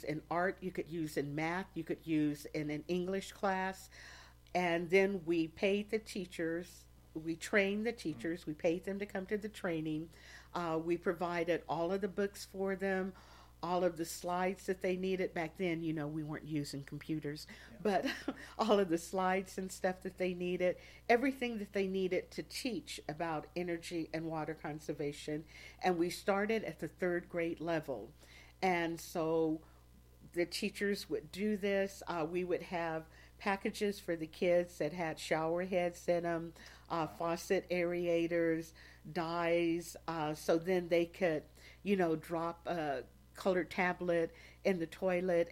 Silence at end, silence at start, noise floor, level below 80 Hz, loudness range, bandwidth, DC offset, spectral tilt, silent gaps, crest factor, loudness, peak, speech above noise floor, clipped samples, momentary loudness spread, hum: 0 s; 0 s; -61 dBFS; -64 dBFS; 3 LU; 16.5 kHz; under 0.1%; -5.5 dB/octave; none; 22 dB; -37 LUFS; -16 dBFS; 25 dB; under 0.1%; 10 LU; none